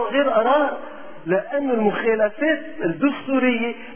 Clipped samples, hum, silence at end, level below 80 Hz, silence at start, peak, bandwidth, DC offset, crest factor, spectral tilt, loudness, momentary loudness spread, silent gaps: under 0.1%; none; 0 s; -60 dBFS; 0 s; -6 dBFS; 3.5 kHz; 1%; 14 dB; -9.5 dB/octave; -21 LUFS; 8 LU; none